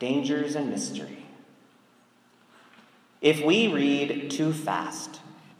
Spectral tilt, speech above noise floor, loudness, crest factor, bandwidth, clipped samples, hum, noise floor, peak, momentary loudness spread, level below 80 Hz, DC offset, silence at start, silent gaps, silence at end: -4.5 dB/octave; 35 dB; -26 LUFS; 22 dB; 15.5 kHz; under 0.1%; none; -61 dBFS; -6 dBFS; 18 LU; -80 dBFS; under 0.1%; 0 s; none; 0.25 s